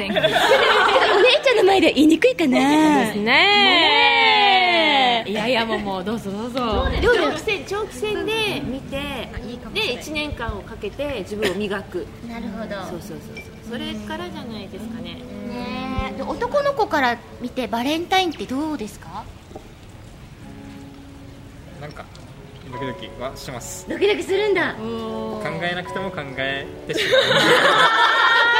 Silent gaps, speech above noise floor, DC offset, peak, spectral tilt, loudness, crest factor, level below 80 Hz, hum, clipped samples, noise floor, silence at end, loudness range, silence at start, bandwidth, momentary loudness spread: none; 20 dB; under 0.1%; -2 dBFS; -4 dB/octave; -18 LUFS; 18 dB; -42 dBFS; none; under 0.1%; -41 dBFS; 0 s; 18 LU; 0 s; 16 kHz; 19 LU